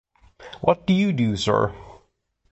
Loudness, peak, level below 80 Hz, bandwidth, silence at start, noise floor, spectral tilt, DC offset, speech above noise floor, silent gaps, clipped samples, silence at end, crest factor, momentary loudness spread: -22 LUFS; -4 dBFS; -48 dBFS; 8.2 kHz; 0.4 s; -67 dBFS; -6.5 dB/octave; under 0.1%; 46 dB; none; under 0.1%; 0.6 s; 20 dB; 15 LU